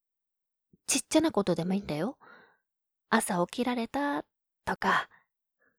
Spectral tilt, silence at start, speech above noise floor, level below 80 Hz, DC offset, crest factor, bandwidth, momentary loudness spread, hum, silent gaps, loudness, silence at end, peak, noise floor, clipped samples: -4 dB/octave; 0.9 s; 58 dB; -64 dBFS; under 0.1%; 20 dB; 18.5 kHz; 11 LU; none; none; -30 LUFS; 0.75 s; -10 dBFS; -87 dBFS; under 0.1%